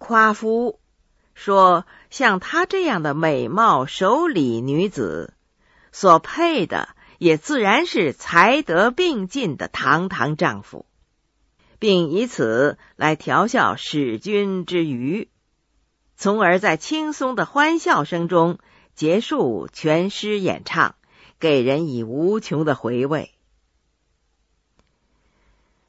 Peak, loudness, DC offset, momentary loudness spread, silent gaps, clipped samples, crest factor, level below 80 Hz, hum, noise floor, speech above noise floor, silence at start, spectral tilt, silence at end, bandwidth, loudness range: 0 dBFS; -19 LUFS; under 0.1%; 9 LU; none; under 0.1%; 20 dB; -60 dBFS; none; -68 dBFS; 49 dB; 0 s; -5.5 dB/octave; 2.65 s; 8 kHz; 4 LU